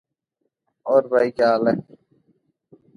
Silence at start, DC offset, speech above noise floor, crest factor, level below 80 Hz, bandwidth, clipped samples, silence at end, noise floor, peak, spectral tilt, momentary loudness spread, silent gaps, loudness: 0.85 s; under 0.1%; 58 dB; 18 dB; -68 dBFS; 10 kHz; under 0.1%; 1.15 s; -76 dBFS; -4 dBFS; -7 dB/octave; 9 LU; none; -20 LUFS